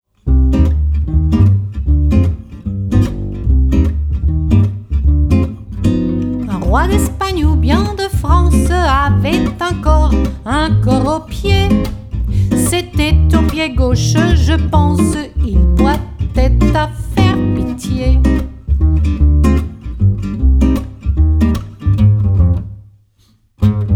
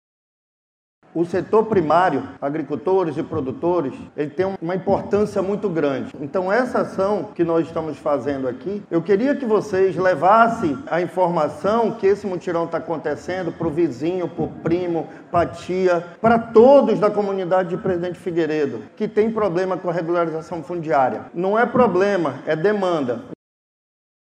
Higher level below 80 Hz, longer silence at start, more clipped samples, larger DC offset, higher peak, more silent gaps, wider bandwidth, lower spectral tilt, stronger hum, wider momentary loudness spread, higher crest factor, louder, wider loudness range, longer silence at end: first, -16 dBFS vs -56 dBFS; second, 0.25 s vs 1.15 s; neither; neither; about the same, 0 dBFS vs 0 dBFS; neither; first, 14 kHz vs 10 kHz; about the same, -6.5 dB/octave vs -7.5 dB/octave; neither; about the same, 7 LU vs 9 LU; second, 12 dB vs 20 dB; first, -14 LUFS vs -20 LUFS; second, 2 LU vs 5 LU; second, 0 s vs 1.05 s